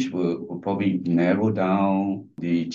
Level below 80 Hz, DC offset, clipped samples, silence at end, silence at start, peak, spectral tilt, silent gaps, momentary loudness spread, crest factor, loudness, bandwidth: -66 dBFS; under 0.1%; under 0.1%; 0 s; 0 s; -8 dBFS; -8 dB/octave; none; 7 LU; 14 dB; -24 LUFS; 7.4 kHz